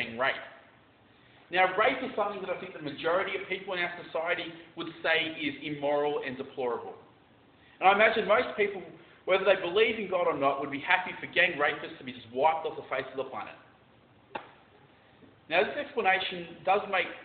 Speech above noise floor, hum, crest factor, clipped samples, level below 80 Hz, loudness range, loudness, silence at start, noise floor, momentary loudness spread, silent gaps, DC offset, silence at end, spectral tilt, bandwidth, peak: 31 dB; none; 24 dB; under 0.1%; -70 dBFS; 7 LU; -29 LUFS; 0 s; -60 dBFS; 16 LU; none; under 0.1%; 0 s; -1 dB/octave; 4.6 kHz; -8 dBFS